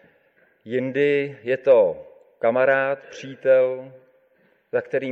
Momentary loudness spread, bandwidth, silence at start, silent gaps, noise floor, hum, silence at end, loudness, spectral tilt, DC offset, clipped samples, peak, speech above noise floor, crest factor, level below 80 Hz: 12 LU; 6.6 kHz; 0.65 s; none; -62 dBFS; none; 0 s; -21 LUFS; -6.5 dB/octave; under 0.1%; under 0.1%; -6 dBFS; 41 dB; 16 dB; -72 dBFS